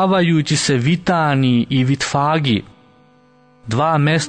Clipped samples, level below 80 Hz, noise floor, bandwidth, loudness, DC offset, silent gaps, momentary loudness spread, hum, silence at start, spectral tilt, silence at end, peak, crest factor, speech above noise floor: under 0.1%; -50 dBFS; -51 dBFS; 9.6 kHz; -16 LUFS; under 0.1%; none; 4 LU; none; 0 s; -5.5 dB/octave; 0 s; -4 dBFS; 12 dB; 36 dB